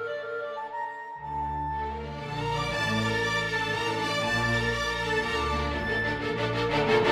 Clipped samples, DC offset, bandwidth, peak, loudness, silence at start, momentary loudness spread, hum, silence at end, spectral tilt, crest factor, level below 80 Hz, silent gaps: under 0.1%; under 0.1%; 16 kHz; -10 dBFS; -28 LUFS; 0 s; 9 LU; none; 0 s; -4.5 dB/octave; 20 dB; -44 dBFS; none